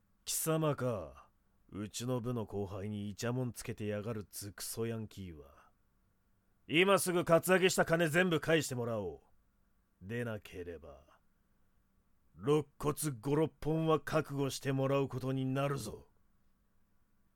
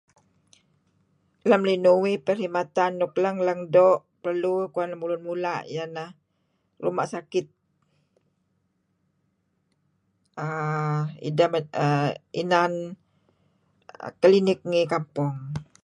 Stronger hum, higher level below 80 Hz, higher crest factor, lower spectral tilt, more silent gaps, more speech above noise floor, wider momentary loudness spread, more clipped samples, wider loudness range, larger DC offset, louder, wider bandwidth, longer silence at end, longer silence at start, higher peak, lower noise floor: neither; first, -62 dBFS vs -70 dBFS; about the same, 20 dB vs 20 dB; second, -5 dB/octave vs -7 dB/octave; neither; second, 39 dB vs 49 dB; about the same, 16 LU vs 14 LU; neither; about the same, 11 LU vs 12 LU; neither; second, -34 LUFS vs -24 LUFS; first, 19 kHz vs 10.5 kHz; first, 1.35 s vs 0.2 s; second, 0.25 s vs 1.45 s; second, -16 dBFS vs -6 dBFS; about the same, -74 dBFS vs -72 dBFS